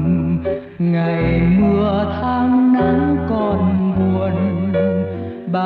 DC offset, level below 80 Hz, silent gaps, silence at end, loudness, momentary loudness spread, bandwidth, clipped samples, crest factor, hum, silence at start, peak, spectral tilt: under 0.1%; -34 dBFS; none; 0 s; -17 LUFS; 7 LU; 4.7 kHz; under 0.1%; 12 dB; none; 0 s; -4 dBFS; -11 dB/octave